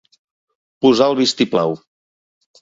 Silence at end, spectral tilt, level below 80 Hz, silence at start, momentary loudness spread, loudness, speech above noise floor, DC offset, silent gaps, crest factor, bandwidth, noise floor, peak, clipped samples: 0.85 s; -4.5 dB/octave; -60 dBFS; 0.8 s; 8 LU; -16 LUFS; over 75 dB; under 0.1%; none; 18 dB; 7.8 kHz; under -90 dBFS; 0 dBFS; under 0.1%